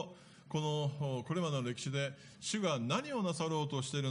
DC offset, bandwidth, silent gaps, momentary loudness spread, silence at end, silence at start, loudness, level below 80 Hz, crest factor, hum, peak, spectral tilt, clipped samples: under 0.1%; 10.5 kHz; none; 5 LU; 0 s; 0 s; -37 LUFS; -76 dBFS; 18 dB; none; -20 dBFS; -5 dB/octave; under 0.1%